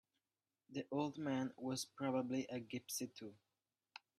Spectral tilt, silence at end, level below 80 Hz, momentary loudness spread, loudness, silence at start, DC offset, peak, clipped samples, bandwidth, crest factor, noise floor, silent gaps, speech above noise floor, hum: -4.5 dB/octave; 0.85 s; -86 dBFS; 15 LU; -44 LUFS; 0.7 s; under 0.1%; -26 dBFS; under 0.1%; 13.5 kHz; 18 dB; under -90 dBFS; none; over 47 dB; none